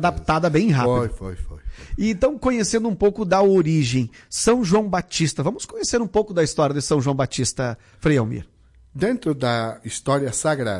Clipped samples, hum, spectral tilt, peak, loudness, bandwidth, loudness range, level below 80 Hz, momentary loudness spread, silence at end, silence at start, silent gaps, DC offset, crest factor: under 0.1%; none; -5.5 dB/octave; -8 dBFS; -21 LUFS; 11.5 kHz; 4 LU; -40 dBFS; 10 LU; 0 s; 0 s; none; under 0.1%; 14 dB